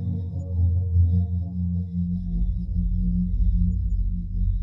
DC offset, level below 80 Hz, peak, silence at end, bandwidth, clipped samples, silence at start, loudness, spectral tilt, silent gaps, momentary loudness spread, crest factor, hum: under 0.1%; -26 dBFS; -10 dBFS; 0 s; 1 kHz; under 0.1%; 0 s; -26 LUFS; -12.5 dB/octave; none; 7 LU; 12 dB; none